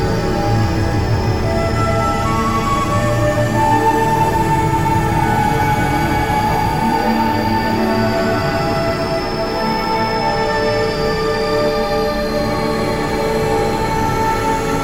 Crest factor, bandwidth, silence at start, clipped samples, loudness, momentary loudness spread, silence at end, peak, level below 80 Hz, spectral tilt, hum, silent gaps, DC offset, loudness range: 12 dB; 17 kHz; 0 s; under 0.1%; -16 LUFS; 3 LU; 0 s; -4 dBFS; -28 dBFS; -6 dB/octave; none; none; under 0.1%; 2 LU